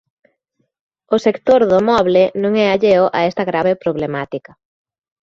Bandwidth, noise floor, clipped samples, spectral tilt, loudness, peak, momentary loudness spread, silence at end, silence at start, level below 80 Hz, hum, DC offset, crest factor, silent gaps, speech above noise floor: 7.4 kHz; -68 dBFS; under 0.1%; -6.5 dB/octave; -15 LUFS; -2 dBFS; 9 LU; 0.85 s; 1.1 s; -52 dBFS; none; under 0.1%; 14 dB; none; 54 dB